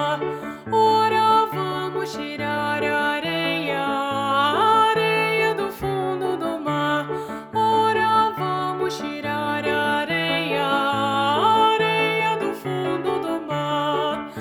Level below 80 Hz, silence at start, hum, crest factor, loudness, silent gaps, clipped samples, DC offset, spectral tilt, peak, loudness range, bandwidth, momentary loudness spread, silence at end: -58 dBFS; 0 s; none; 16 dB; -21 LUFS; none; under 0.1%; under 0.1%; -5 dB/octave; -6 dBFS; 2 LU; over 20 kHz; 9 LU; 0 s